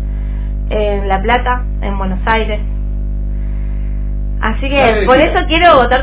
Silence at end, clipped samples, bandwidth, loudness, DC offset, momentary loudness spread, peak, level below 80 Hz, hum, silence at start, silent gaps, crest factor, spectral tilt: 0 s; 0.2%; 4 kHz; -14 LUFS; under 0.1%; 12 LU; 0 dBFS; -18 dBFS; 50 Hz at -15 dBFS; 0 s; none; 12 dB; -9.5 dB/octave